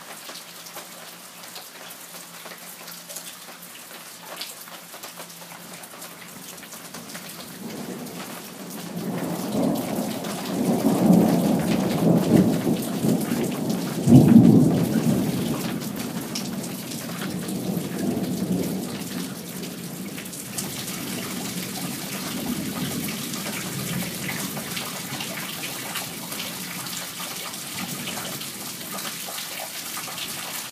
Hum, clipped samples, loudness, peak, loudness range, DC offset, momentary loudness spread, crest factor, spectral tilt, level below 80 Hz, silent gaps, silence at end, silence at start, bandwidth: none; under 0.1%; -25 LUFS; 0 dBFS; 18 LU; under 0.1%; 18 LU; 24 dB; -5 dB/octave; -58 dBFS; none; 0 s; 0 s; 15.5 kHz